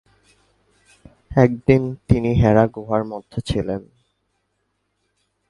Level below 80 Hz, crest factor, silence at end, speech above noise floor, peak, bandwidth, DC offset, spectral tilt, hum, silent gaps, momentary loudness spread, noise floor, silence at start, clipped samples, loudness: -38 dBFS; 20 dB; 1.7 s; 53 dB; 0 dBFS; 11.5 kHz; under 0.1%; -8.5 dB/octave; 50 Hz at -45 dBFS; none; 13 LU; -71 dBFS; 1.3 s; under 0.1%; -19 LUFS